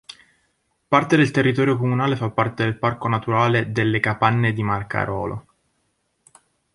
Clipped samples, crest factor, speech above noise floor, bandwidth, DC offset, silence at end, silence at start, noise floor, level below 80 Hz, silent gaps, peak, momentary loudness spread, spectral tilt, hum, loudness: under 0.1%; 20 dB; 50 dB; 11.5 kHz; under 0.1%; 1.35 s; 0.9 s; -70 dBFS; -52 dBFS; none; -2 dBFS; 7 LU; -7 dB/octave; none; -20 LUFS